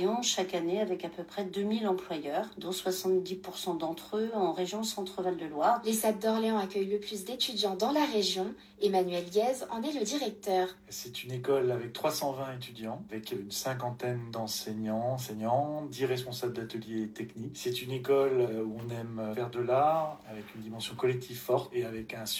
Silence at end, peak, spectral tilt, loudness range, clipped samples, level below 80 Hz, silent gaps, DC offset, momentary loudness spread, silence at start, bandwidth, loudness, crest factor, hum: 0 s; -16 dBFS; -4.5 dB/octave; 4 LU; under 0.1%; -70 dBFS; none; under 0.1%; 10 LU; 0 s; 16.5 kHz; -32 LUFS; 18 dB; none